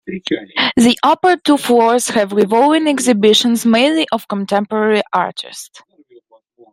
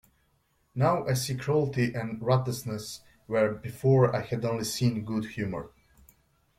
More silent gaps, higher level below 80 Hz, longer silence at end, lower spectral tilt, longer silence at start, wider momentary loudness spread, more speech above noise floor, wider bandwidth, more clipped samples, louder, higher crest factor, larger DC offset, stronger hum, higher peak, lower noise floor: neither; about the same, -58 dBFS vs -58 dBFS; about the same, 0.95 s vs 0.9 s; second, -3.5 dB/octave vs -6 dB/octave; second, 0.05 s vs 0.75 s; second, 9 LU vs 13 LU; second, 35 dB vs 43 dB; about the same, 16 kHz vs 16 kHz; neither; first, -14 LUFS vs -28 LUFS; second, 14 dB vs 20 dB; neither; neither; first, 0 dBFS vs -10 dBFS; second, -49 dBFS vs -70 dBFS